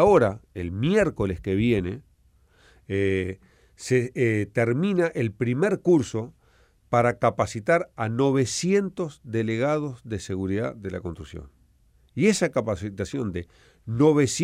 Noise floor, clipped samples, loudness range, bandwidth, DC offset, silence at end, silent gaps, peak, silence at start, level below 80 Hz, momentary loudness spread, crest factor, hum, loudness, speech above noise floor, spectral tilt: -60 dBFS; under 0.1%; 4 LU; 14.5 kHz; under 0.1%; 0 s; none; -6 dBFS; 0 s; -50 dBFS; 13 LU; 18 dB; none; -25 LUFS; 36 dB; -6 dB/octave